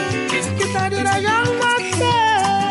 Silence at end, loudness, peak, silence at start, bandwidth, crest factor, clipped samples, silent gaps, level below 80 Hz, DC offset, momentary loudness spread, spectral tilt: 0 s; -18 LUFS; -8 dBFS; 0 s; 11.5 kHz; 10 dB; under 0.1%; none; -56 dBFS; under 0.1%; 4 LU; -4 dB/octave